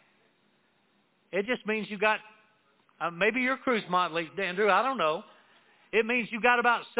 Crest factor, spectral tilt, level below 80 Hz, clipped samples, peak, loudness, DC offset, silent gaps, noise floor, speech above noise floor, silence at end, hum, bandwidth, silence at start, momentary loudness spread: 22 dB; -2 dB/octave; -74 dBFS; under 0.1%; -8 dBFS; -28 LUFS; under 0.1%; none; -69 dBFS; 42 dB; 0 s; none; 4 kHz; 1.35 s; 9 LU